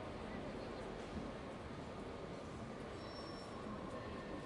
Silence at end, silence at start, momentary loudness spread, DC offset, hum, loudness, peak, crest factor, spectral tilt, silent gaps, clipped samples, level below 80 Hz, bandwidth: 0 s; 0 s; 2 LU; under 0.1%; none; -49 LUFS; -34 dBFS; 14 dB; -6 dB/octave; none; under 0.1%; -60 dBFS; 11.5 kHz